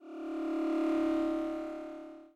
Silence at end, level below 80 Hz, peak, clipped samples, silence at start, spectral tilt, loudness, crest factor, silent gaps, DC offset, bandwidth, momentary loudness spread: 0.1 s; -64 dBFS; -24 dBFS; under 0.1%; 0 s; -5.5 dB/octave; -34 LUFS; 10 dB; none; under 0.1%; 8.8 kHz; 13 LU